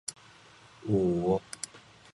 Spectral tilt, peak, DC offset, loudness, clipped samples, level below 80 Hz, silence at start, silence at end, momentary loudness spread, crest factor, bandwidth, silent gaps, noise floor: -6 dB/octave; -14 dBFS; under 0.1%; -31 LUFS; under 0.1%; -56 dBFS; 0.1 s; 0.4 s; 15 LU; 18 dB; 11.5 kHz; none; -56 dBFS